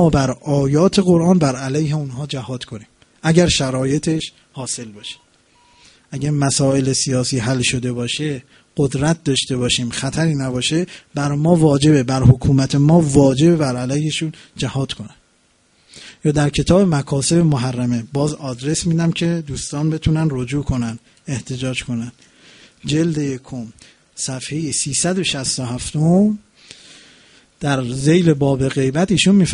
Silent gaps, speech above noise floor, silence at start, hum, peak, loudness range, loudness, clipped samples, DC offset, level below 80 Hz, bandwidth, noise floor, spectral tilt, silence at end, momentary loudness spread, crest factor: none; 41 dB; 0 s; none; 0 dBFS; 7 LU; -17 LUFS; under 0.1%; under 0.1%; -40 dBFS; 11 kHz; -58 dBFS; -5.5 dB/octave; 0 s; 14 LU; 18 dB